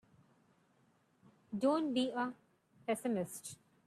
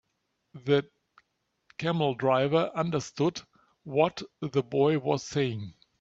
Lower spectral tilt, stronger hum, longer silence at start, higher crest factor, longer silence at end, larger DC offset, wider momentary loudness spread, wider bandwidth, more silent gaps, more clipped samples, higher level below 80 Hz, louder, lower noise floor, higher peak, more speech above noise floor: second, -4.5 dB/octave vs -6 dB/octave; neither; first, 1.5 s vs 0.55 s; about the same, 18 dB vs 20 dB; about the same, 0.35 s vs 0.3 s; neither; about the same, 14 LU vs 13 LU; first, 14.5 kHz vs 7.8 kHz; neither; neither; second, -82 dBFS vs -68 dBFS; second, -37 LUFS vs -28 LUFS; second, -73 dBFS vs -78 dBFS; second, -22 dBFS vs -10 dBFS; second, 37 dB vs 51 dB